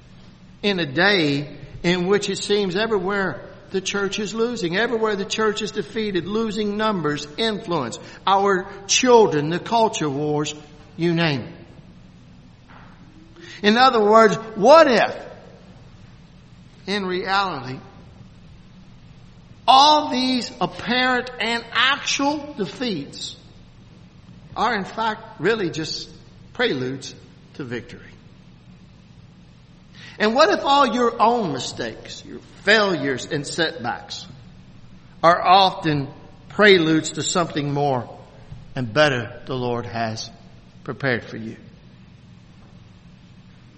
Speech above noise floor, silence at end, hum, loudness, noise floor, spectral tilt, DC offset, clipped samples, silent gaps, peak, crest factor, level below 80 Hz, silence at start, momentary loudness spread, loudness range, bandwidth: 27 dB; 0.7 s; none; -20 LUFS; -47 dBFS; -4 dB/octave; under 0.1%; under 0.1%; none; 0 dBFS; 22 dB; -52 dBFS; 0.2 s; 19 LU; 10 LU; 8.8 kHz